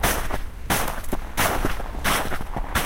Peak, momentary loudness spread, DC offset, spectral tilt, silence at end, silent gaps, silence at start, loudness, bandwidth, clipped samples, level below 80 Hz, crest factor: -6 dBFS; 8 LU; under 0.1%; -3 dB/octave; 0 s; none; 0 s; -26 LUFS; 17 kHz; under 0.1%; -30 dBFS; 18 dB